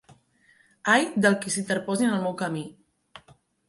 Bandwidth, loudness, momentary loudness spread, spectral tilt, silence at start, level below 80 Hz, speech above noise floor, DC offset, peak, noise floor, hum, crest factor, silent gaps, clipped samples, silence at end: 11.5 kHz; -25 LUFS; 10 LU; -4 dB/octave; 0.85 s; -70 dBFS; 37 dB; under 0.1%; -6 dBFS; -62 dBFS; none; 20 dB; none; under 0.1%; 0.5 s